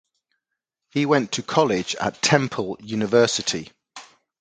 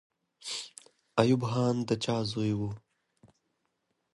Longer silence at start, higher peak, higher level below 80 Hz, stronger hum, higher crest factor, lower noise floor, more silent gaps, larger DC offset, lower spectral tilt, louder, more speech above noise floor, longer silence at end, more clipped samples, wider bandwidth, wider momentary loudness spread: first, 0.95 s vs 0.45 s; first, 0 dBFS vs -8 dBFS; about the same, -60 dBFS vs -64 dBFS; neither; about the same, 22 dB vs 24 dB; first, -83 dBFS vs -79 dBFS; neither; neither; second, -4 dB/octave vs -6 dB/octave; first, -22 LUFS vs -30 LUFS; first, 61 dB vs 51 dB; second, 0.35 s vs 1.35 s; neither; second, 9.6 kHz vs 11.5 kHz; second, 11 LU vs 15 LU